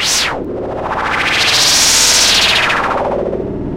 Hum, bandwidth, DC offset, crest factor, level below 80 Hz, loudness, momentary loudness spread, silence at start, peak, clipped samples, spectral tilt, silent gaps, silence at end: none; 16 kHz; under 0.1%; 14 dB; -34 dBFS; -10 LUFS; 13 LU; 0 s; 0 dBFS; under 0.1%; -1 dB/octave; none; 0 s